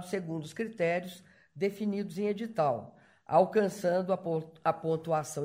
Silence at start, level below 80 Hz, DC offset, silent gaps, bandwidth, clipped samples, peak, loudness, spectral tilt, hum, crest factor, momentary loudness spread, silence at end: 0 s; -74 dBFS; under 0.1%; none; 16 kHz; under 0.1%; -12 dBFS; -31 LUFS; -6 dB/octave; none; 20 dB; 10 LU; 0 s